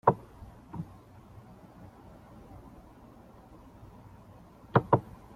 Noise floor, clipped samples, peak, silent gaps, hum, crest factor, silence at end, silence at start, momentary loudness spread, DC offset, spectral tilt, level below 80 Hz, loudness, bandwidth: -53 dBFS; under 0.1%; -6 dBFS; none; none; 30 dB; 0.35 s; 0.05 s; 25 LU; under 0.1%; -9 dB/octave; -58 dBFS; -31 LUFS; 14 kHz